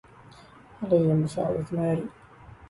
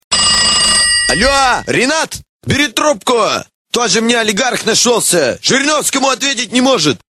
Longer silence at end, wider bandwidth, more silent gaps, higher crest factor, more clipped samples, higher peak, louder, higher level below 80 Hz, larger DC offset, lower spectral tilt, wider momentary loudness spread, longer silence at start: about the same, 0.05 s vs 0.15 s; second, 11.5 kHz vs 16 kHz; second, none vs 2.29-2.40 s, 3.54-3.65 s; about the same, 16 dB vs 12 dB; neither; second, -10 dBFS vs 0 dBFS; second, -26 LUFS vs -11 LUFS; second, -56 dBFS vs -38 dBFS; neither; first, -9 dB/octave vs -2 dB/octave; first, 12 LU vs 8 LU; first, 0.7 s vs 0.1 s